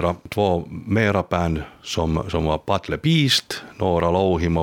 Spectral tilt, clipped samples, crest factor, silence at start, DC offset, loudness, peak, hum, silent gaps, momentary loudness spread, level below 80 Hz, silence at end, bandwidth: -5.5 dB/octave; under 0.1%; 18 dB; 0 s; under 0.1%; -21 LUFS; -4 dBFS; none; none; 7 LU; -38 dBFS; 0 s; 17.5 kHz